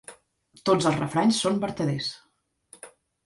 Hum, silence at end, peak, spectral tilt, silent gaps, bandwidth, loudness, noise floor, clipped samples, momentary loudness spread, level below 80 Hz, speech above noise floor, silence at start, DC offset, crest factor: none; 0.4 s; -8 dBFS; -5 dB/octave; none; 11.5 kHz; -25 LUFS; -60 dBFS; under 0.1%; 24 LU; -62 dBFS; 35 dB; 0.1 s; under 0.1%; 18 dB